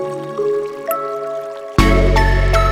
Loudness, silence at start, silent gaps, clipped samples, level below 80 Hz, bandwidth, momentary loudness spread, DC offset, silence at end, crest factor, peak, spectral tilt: -17 LUFS; 0 s; none; under 0.1%; -18 dBFS; 14.5 kHz; 10 LU; under 0.1%; 0 s; 16 dB; 0 dBFS; -6 dB/octave